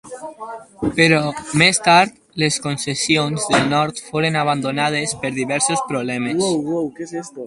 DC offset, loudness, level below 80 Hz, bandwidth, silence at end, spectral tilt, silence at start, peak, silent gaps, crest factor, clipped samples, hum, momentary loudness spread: under 0.1%; -18 LUFS; -52 dBFS; 11.5 kHz; 0 s; -3.5 dB/octave; 0.05 s; 0 dBFS; none; 18 dB; under 0.1%; none; 12 LU